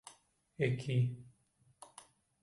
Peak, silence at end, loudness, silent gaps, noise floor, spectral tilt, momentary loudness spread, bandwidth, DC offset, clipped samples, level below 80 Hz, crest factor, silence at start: -18 dBFS; 0.6 s; -36 LUFS; none; -72 dBFS; -7 dB/octave; 24 LU; 11.5 kHz; under 0.1%; under 0.1%; -72 dBFS; 20 dB; 0.05 s